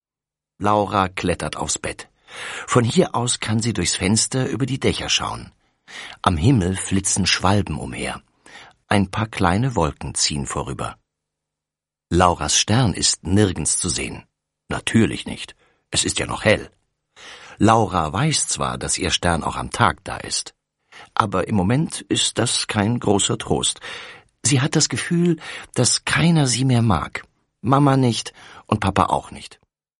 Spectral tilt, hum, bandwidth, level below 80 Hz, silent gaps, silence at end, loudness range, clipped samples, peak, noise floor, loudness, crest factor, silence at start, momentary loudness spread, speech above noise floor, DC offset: -4 dB/octave; none; 11.5 kHz; -42 dBFS; none; 0.55 s; 3 LU; under 0.1%; 0 dBFS; -89 dBFS; -20 LUFS; 20 dB; 0.6 s; 14 LU; 69 dB; under 0.1%